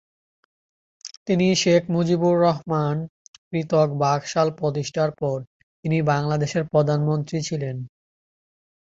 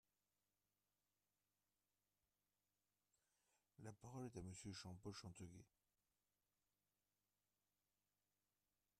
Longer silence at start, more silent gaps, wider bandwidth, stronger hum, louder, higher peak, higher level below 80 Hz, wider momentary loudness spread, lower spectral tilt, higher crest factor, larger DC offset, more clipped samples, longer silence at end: second, 1.05 s vs 3.8 s; first, 1.17-1.26 s, 3.09-3.51 s, 5.47-5.83 s vs none; second, 7.8 kHz vs 13 kHz; second, none vs 50 Hz at -85 dBFS; first, -22 LUFS vs -58 LUFS; first, -6 dBFS vs -42 dBFS; first, -60 dBFS vs -84 dBFS; first, 13 LU vs 7 LU; about the same, -6 dB/octave vs -5 dB/octave; about the same, 18 dB vs 22 dB; neither; neither; second, 0.95 s vs 3.35 s